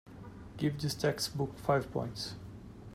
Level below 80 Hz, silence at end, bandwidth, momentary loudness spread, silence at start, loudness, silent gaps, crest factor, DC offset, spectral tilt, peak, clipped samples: -58 dBFS; 0 s; 16 kHz; 18 LU; 0.05 s; -35 LUFS; none; 20 dB; under 0.1%; -5 dB/octave; -16 dBFS; under 0.1%